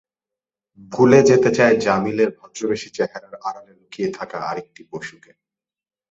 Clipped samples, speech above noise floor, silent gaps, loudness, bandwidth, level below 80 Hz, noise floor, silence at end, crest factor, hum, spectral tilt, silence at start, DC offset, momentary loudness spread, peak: under 0.1%; over 71 dB; none; -18 LUFS; 8 kHz; -58 dBFS; under -90 dBFS; 1 s; 20 dB; none; -5.5 dB/octave; 0.9 s; under 0.1%; 20 LU; 0 dBFS